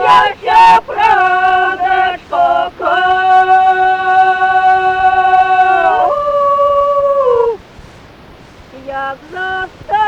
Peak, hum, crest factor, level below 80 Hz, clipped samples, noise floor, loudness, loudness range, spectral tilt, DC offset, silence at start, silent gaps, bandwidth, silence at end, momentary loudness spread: -2 dBFS; none; 10 dB; -44 dBFS; under 0.1%; -37 dBFS; -11 LUFS; 5 LU; -4 dB/octave; under 0.1%; 0 s; none; 9 kHz; 0 s; 12 LU